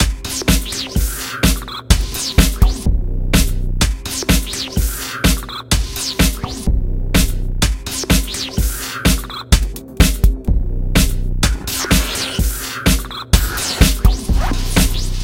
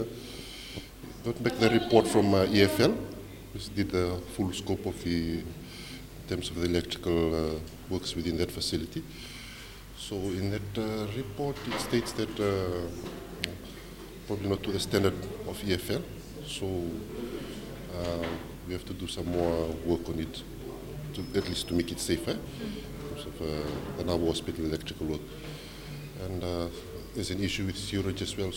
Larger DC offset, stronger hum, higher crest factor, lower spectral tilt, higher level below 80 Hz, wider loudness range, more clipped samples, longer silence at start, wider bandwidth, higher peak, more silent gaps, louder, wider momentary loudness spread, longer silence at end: neither; neither; second, 16 dB vs 26 dB; second, -4 dB/octave vs -5.5 dB/octave; first, -18 dBFS vs -48 dBFS; second, 2 LU vs 8 LU; neither; about the same, 0 s vs 0 s; about the same, 17 kHz vs 17 kHz; first, 0 dBFS vs -6 dBFS; neither; first, -17 LUFS vs -32 LUFS; second, 6 LU vs 15 LU; about the same, 0 s vs 0 s